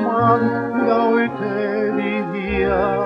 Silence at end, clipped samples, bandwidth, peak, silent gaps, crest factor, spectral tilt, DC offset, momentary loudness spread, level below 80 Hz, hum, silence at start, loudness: 0 s; under 0.1%; 5.8 kHz; -2 dBFS; none; 16 dB; -9 dB/octave; under 0.1%; 6 LU; -40 dBFS; none; 0 s; -19 LUFS